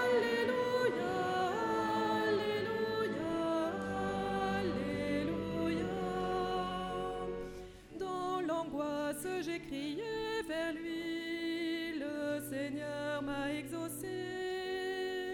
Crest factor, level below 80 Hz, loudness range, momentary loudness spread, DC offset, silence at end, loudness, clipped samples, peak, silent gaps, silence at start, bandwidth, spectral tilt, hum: 16 dB; -60 dBFS; 4 LU; 7 LU; under 0.1%; 0 s; -36 LUFS; under 0.1%; -20 dBFS; none; 0 s; 18 kHz; -5 dB/octave; none